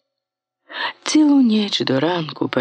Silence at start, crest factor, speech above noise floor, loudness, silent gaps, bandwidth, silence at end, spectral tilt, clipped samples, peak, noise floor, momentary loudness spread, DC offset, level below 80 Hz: 0.7 s; 16 dB; 66 dB; -18 LUFS; none; 9.4 kHz; 0 s; -4.5 dB/octave; under 0.1%; -4 dBFS; -83 dBFS; 12 LU; under 0.1%; -70 dBFS